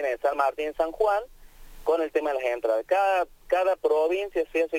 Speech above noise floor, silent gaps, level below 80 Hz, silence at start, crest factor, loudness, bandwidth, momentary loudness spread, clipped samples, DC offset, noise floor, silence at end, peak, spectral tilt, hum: 20 dB; none; -52 dBFS; 0 s; 16 dB; -26 LUFS; 17 kHz; 4 LU; under 0.1%; under 0.1%; -45 dBFS; 0 s; -10 dBFS; -3.5 dB/octave; none